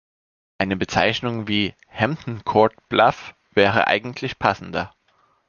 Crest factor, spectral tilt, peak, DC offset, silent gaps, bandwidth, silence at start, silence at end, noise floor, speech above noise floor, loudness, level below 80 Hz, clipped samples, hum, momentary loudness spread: 22 dB; -5.5 dB/octave; 0 dBFS; under 0.1%; none; 7.2 kHz; 0.6 s; 0.6 s; -62 dBFS; 42 dB; -21 LUFS; -50 dBFS; under 0.1%; none; 10 LU